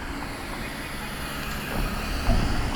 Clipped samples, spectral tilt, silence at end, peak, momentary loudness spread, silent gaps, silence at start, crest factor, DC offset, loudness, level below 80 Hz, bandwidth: under 0.1%; -4.5 dB/octave; 0 s; -10 dBFS; 7 LU; none; 0 s; 18 dB; under 0.1%; -30 LUFS; -30 dBFS; 19.5 kHz